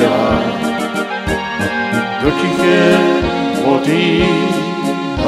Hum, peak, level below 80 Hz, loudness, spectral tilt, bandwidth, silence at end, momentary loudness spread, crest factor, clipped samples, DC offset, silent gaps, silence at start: none; 0 dBFS; -34 dBFS; -14 LUFS; -5.5 dB/octave; 14.5 kHz; 0 s; 8 LU; 14 dB; under 0.1%; under 0.1%; none; 0 s